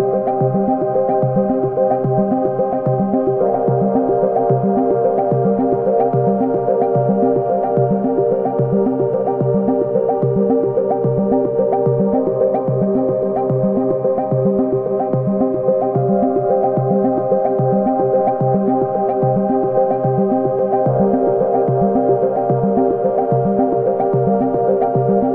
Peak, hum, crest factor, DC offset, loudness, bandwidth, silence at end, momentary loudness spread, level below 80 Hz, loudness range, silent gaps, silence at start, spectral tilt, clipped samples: -4 dBFS; none; 12 dB; under 0.1%; -16 LUFS; 3.1 kHz; 0 s; 2 LU; -50 dBFS; 1 LU; none; 0 s; -13.5 dB/octave; under 0.1%